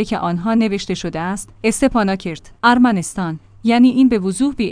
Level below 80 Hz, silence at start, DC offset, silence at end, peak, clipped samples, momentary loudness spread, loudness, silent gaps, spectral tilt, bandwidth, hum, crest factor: -42 dBFS; 0 s; under 0.1%; 0 s; 0 dBFS; under 0.1%; 11 LU; -17 LUFS; none; -5 dB/octave; 10.5 kHz; none; 16 dB